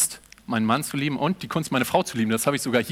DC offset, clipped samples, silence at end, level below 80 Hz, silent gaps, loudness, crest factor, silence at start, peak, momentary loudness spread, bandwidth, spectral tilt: under 0.1%; under 0.1%; 0 s; -58 dBFS; none; -24 LUFS; 18 dB; 0 s; -6 dBFS; 5 LU; 16.5 kHz; -4 dB/octave